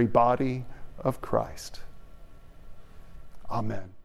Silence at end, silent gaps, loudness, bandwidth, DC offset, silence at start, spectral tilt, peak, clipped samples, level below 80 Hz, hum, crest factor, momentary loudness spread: 0 s; none; -29 LUFS; 14 kHz; under 0.1%; 0 s; -7 dB/octave; -8 dBFS; under 0.1%; -46 dBFS; none; 22 dB; 20 LU